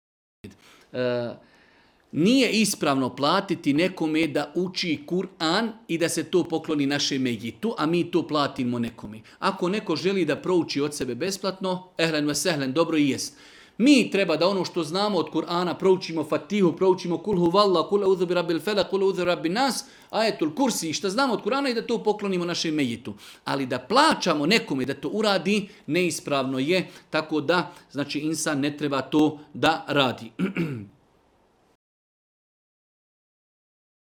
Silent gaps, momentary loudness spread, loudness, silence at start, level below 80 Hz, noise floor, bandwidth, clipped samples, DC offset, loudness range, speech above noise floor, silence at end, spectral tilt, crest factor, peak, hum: none; 8 LU; -24 LUFS; 0.45 s; -64 dBFS; -63 dBFS; 19 kHz; under 0.1%; under 0.1%; 3 LU; 38 dB; 3.25 s; -4.5 dB/octave; 20 dB; -4 dBFS; none